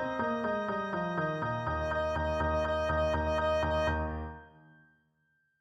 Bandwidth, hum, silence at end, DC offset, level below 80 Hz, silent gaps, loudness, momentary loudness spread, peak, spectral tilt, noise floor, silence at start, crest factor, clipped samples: 8.6 kHz; none; 1.1 s; under 0.1%; -44 dBFS; none; -32 LUFS; 5 LU; -20 dBFS; -7 dB/octave; -75 dBFS; 0 s; 14 dB; under 0.1%